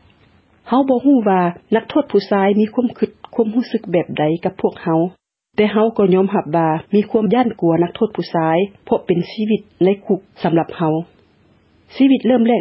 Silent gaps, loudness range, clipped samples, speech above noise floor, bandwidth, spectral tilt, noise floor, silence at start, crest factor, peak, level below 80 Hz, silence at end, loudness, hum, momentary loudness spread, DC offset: none; 3 LU; under 0.1%; 38 dB; 5.8 kHz; -11 dB/octave; -54 dBFS; 0.65 s; 14 dB; -2 dBFS; -58 dBFS; 0 s; -17 LUFS; none; 7 LU; under 0.1%